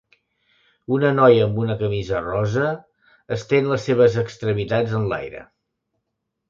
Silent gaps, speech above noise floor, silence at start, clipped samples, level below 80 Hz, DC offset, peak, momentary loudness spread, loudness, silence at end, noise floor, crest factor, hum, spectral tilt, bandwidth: none; 59 dB; 0.9 s; under 0.1%; -50 dBFS; under 0.1%; -2 dBFS; 15 LU; -20 LUFS; 1.05 s; -78 dBFS; 18 dB; none; -7.5 dB/octave; 7.6 kHz